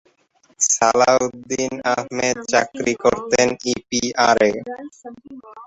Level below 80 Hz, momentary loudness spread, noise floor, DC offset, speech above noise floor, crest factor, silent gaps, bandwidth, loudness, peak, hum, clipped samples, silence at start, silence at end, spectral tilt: -54 dBFS; 11 LU; -59 dBFS; under 0.1%; 40 dB; 18 dB; none; 8.2 kHz; -18 LUFS; -2 dBFS; none; under 0.1%; 0.6 s; 0 s; -2.5 dB/octave